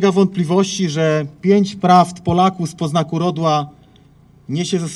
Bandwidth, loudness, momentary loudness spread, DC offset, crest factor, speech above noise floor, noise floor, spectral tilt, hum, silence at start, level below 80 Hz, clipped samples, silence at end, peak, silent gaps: 12 kHz; -17 LUFS; 8 LU; under 0.1%; 16 dB; 32 dB; -48 dBFS; -6 dB/octave; none; 0 s; -50 dBFS; under 0.1%; 0 s; 0 dBFS; none